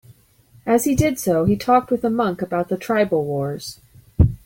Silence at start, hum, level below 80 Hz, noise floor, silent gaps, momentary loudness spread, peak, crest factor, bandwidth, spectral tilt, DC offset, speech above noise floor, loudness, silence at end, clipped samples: 0.65 s; none; -36 dBFS; -53 dBFS; none; 12 LU; -4 dBFS; 16 dB; 17 kHz; -6.5 dB/octave; under 0.1%; 33 dB; -20 LUFS; 0.1 s; under 0.1%